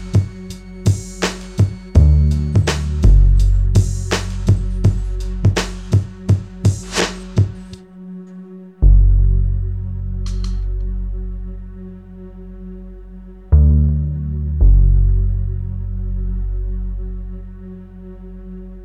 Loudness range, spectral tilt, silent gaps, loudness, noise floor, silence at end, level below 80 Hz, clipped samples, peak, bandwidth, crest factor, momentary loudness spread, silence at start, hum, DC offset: 11 LU; -6 dB/octave; none; -18 LUFS; -36 dBFS; 0 s; -18 dBFS; under 0.1%; 0 dBFS; 10 kHz; 16 dB; 22 LU; 0 s; none; 0.1%